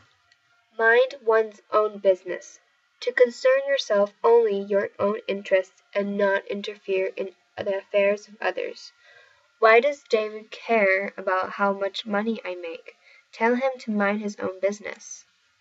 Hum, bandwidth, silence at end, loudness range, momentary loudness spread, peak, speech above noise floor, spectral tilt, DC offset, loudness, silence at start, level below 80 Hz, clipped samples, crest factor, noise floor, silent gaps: none; 8 kHz; 0.4 s; 4 LU; 15 LU; -4 dBFS; 40 dB; -4.5 dB/octave; under 0.1%; -24 LUFS; 0.8 s; -82 dBFS; under 0.1%; 20 dB; -63 dBFS; none